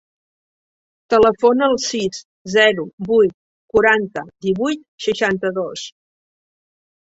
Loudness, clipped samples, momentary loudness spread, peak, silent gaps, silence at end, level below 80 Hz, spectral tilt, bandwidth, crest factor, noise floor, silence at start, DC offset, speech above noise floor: -17 LUFS; under 0.1%; 11 LU; -2 dBFS; 2.25-2.45 s, 2.93-2.98 s, 3.34-3.69 s, 4.88-4.98 s; 1.1 s; -54 dBFS; -4 dB/octave; 8 kHz; 18 dB; under -90 dBFS; 1.1 s; under 0.1%; over 73 dB